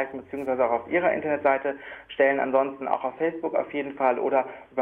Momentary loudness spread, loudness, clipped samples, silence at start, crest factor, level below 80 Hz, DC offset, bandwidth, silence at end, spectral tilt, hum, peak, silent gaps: 9 LU; -25 LUFS; under 0.1%; 0 s; 18 dB; -68 dBFS; under 0.1%; 3.8 kHz; 0 s; -7.5 dB/octave; none; -8 dBFS; none